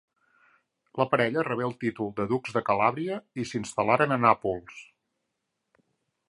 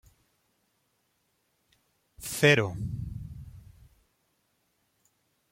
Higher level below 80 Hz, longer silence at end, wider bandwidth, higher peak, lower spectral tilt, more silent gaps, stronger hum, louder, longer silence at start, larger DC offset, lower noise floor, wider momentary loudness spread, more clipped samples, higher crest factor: second, -64 dBFS vs -54 dBFS; second, 1.45 s vs 1.95 s; second, 11.5 kHz vs 16.5 kHz; first, -4 dBFS vs -8 dBFS; first, -6 dB/octave vs -4.5 dB/octave; neither; neither; about the same, -27 LUFS vs -26 LUFS; second, 0.95 s vs 2.2 s; neither; first, -81 dBFS vs -74 dBFS; second, 11 LU vs 24 LU; neither; about the same, 24 dB vs 26 dB